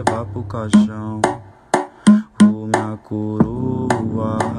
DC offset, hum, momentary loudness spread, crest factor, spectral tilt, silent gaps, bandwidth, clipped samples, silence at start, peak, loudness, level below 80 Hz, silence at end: under 0.1%; none; 11 LU; 16 dB; -6.5 dB/octave; none; 11 kHz; under 0.1%; 0 s; 0 dBFS; -18 LUFS; -46 dBFS; 0 s